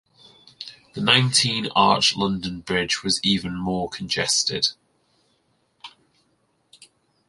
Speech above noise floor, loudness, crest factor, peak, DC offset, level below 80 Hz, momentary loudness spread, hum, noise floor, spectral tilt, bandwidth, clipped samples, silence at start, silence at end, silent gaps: 45 dB; -20 LUFS; 24 dB; -2 dBFS; under 0.1%; -54 dBFS; 12 LU; none; -67 dBFS; -3 dB/octave; 11.5 kHz; under 0.1%; 0.6 s; 1.4 s; none